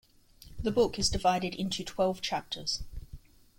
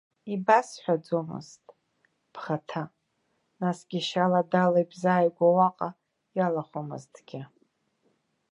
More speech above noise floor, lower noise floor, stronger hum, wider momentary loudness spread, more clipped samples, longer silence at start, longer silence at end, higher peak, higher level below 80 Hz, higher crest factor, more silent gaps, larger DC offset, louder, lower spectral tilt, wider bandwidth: second, 25 dB vs 48 dB; second, -55 dBFS vs -75 dBFS; neither; second, 13 LU vs 19 LU; neither; first, 0.4 s vs 0.25 s; second, 0.4 s vs 1.05 s; second, -14 dBFS vs -6 dBFS; first, -46 dBFS vs -78 dBFS; about the same, 18 dB vs 22 dB; neither; neither; second, -31 LUFS vs -27 LUFS; second, -4 dB/octave vs -6.5 dB/octave; first, 16.5 kHz vs 11 kHz